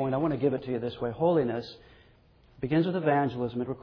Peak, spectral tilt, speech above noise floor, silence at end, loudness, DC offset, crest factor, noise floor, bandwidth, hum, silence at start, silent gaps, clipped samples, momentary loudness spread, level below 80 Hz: -12 dBFS; -9.5 dB/octave; 31 dB; 0 s; -29 LUFS; under 0.1%; 16 dB; -59 dBFS; 5.4 kHz; none; 0 s; none; under 0.1%; 8 LU; -58 dBFS